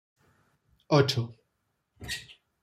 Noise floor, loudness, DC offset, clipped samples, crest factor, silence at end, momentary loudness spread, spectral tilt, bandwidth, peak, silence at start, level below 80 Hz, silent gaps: -78 dBFS; -28 LUFS; under 0.1%; under 0.1%; 24 dB; 0.3 s; 16 LU; -5.5 dB/octave; 15 kHz; -8 dBFS; 0.9 s; -60 dBFS; none